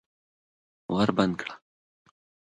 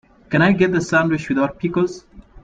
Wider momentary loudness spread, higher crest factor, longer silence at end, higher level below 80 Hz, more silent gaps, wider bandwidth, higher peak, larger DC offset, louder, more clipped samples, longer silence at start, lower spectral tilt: first, 22 LU vs 7 LU; first, 24 dB vs 16 dB; first, 1 s vs 0.05 s; second, -62 dBFS vs -48 dBFS; neither; about the same, 9.4 kHz vs 9.2 kHz; second, -8 dBFS vs -2 dBFS; neither; second, -27 LUFS vs -18 LUFS; neither; first, 0.9 s vs 0.3 s; about the same, -6.5 dB/octave vs -6.5 dB/octave